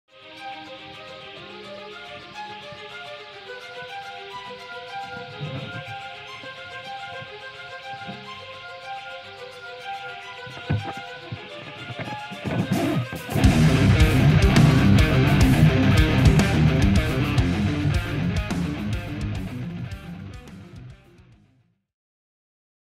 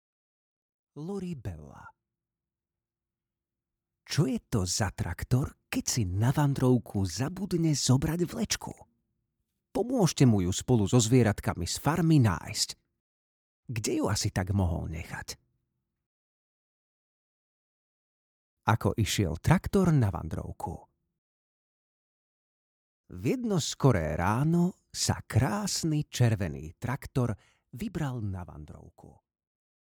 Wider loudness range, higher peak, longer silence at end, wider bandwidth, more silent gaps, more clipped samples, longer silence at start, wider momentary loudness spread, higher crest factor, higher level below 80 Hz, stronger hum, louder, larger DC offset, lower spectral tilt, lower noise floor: first, 19 LU vs 11 LU; first, -4 dBFS vs -8 dBFS; first, 2.05 s vs 0.9 s; second, 15.5 kHz vs 19.5 kHz; second, none vs 13.00-13.63 s, 16.06-18.57 s, 21.18-23.04 s; neither; second, 0.25 s vs 0.95 s; first, 21 LU vs 15 LU; about the same, 20 dB vs 22 dB; first, -32 dBFS vs -50 dBFS; neither; first, -21 LUFS vs -29 LUFS; neither; about the same, -6.5 dB/octave vs -5.5 dB/octave; second, -63 dBFS vs under -90 dBFS